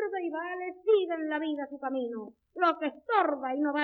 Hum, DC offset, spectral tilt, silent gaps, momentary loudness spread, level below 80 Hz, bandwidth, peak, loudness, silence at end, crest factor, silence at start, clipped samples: none; under 0.1%; -6 dB/octave; none; 9 LU; -78 dBFS; 6 kHz; -12 dBFS; -30 LUFS; 0 s; 18 dB; 0 s; under 0.1%